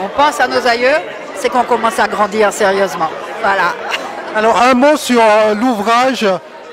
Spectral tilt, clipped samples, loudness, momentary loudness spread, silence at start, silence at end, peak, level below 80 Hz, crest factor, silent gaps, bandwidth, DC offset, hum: -3.5 dB/octave; under 0.1%; -13 LUFS; 10 LU; 0 s; 0 s; 0 dBFS; -50 dBFS; 12 dB; none; 16 kHz; under 0.1%; none